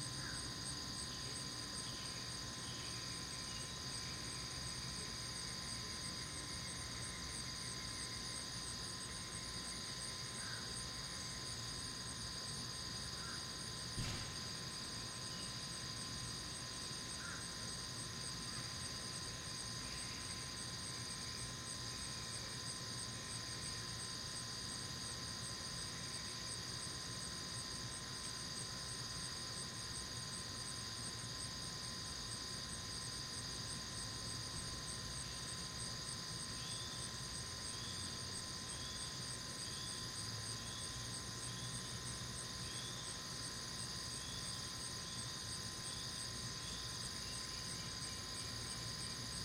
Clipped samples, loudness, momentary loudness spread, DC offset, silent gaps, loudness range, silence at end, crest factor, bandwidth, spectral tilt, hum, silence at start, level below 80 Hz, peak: under 0.1%; -44 LUFS; 1 LU; under 0.1%; none; 0 LU; 0 s; 16 dB; 16 kHz; -2 dB/octave; none; 0 s; -60 dBFS; -32 dBFS